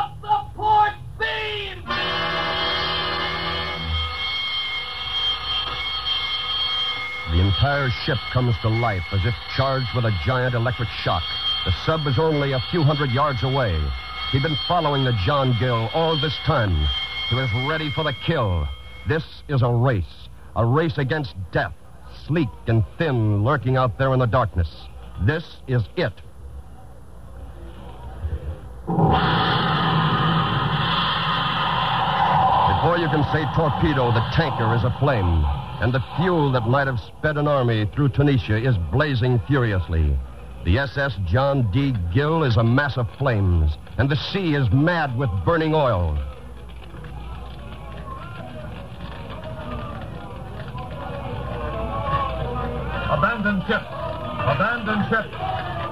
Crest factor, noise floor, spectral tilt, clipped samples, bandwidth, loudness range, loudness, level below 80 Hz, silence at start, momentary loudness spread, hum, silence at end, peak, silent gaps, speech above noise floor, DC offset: 16 dB; -42 dBFS; -7.5 dB/octave; under 0.1%; 11.5 kHz; 9 LU; -22 LUFS; -34 dBFS; 0 s; 15 LU; none; 0 s; -6 dBFS; none; 22 dB; 0.8%